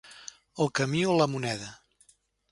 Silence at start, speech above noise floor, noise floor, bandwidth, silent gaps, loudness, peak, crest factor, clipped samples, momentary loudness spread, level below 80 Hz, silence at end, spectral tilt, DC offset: 0.05 s; 38 dB; -65 dBFS; 11.5 kHz; none; -28 LUFS; -10 dBFS; 20 dB; under 0.1%; 19 LU; -66 dBFS; 0.75 s; -5 dB/octave; under 0.1%